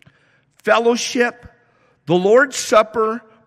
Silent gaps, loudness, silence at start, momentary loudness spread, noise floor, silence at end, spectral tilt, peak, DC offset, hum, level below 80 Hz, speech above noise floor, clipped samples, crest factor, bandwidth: none; -16 LUFS; 0.65 s; 7 LU; -58 dBFS; 0.3 s; -3.5 dB/octave; -2 dBFS; under 0.1%; none; -58 dBFS; 42 dB; under 0.1%; 16 dB; 14.5 kHz